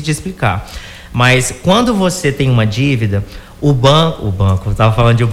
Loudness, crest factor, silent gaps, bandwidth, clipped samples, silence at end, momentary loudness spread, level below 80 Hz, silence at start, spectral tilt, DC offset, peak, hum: -13 LUFS; 12 dB; none; 15.5 kHz; under 0.1%; 0 s; 11 LU; -30 dBFS; 0 s; -5.5 dB/octave; under 0.1%; 0 dBFS; none